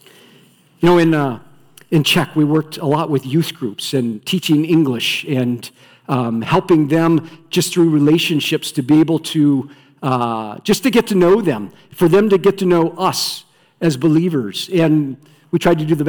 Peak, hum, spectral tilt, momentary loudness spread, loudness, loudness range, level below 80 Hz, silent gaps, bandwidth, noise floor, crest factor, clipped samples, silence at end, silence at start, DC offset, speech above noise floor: -6 dBFS; none; -5.5 dB/octave; 9 LU; -16 LUFS; 3 LU; -52 dBFS; none; 19 kHz; -50 dBFS; 10 dB; under 0.1%; 0 s; 0.8 s; under 0.1%; 34 dB